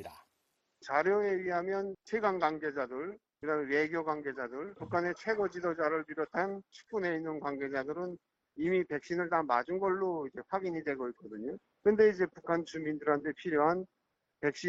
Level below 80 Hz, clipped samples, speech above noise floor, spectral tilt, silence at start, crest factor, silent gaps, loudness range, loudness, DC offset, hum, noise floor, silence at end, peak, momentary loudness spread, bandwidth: -72 dBFS; under 0.1%; 46 dB; -6.5 dB/octave; 0 s; 18 dB; none; 3 LU; -34 LUFS; under 0.1%; none; -80 dBFS; 0 s; -14 dBFS; 12 LU; 7.8 kHz